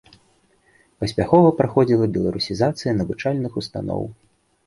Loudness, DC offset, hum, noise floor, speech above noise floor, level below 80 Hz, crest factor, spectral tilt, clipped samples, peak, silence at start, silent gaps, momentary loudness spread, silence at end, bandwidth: -20 LUFS; under 0.1%; none; -60 dBFS; 41 dB; -46 dBFS; 20 dB; -7 dB/octave; under 0.1%; -2 dBFS; 1 s; none; 13 LU; 0.55 s; 11.5 kHz